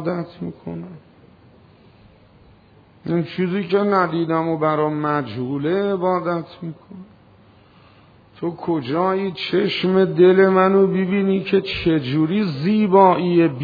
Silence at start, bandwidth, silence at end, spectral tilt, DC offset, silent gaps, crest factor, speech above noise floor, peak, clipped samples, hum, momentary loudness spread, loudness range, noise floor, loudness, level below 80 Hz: 0 s; 5 kHz; 0 s; -9 dB/octave; under 0.1%; none; 18 dB; 32 dB; -2 dBFS; under 0.1%; none; 17 LU; 10 LU; -51 dBFS; -19 LUFS; -54 dBFS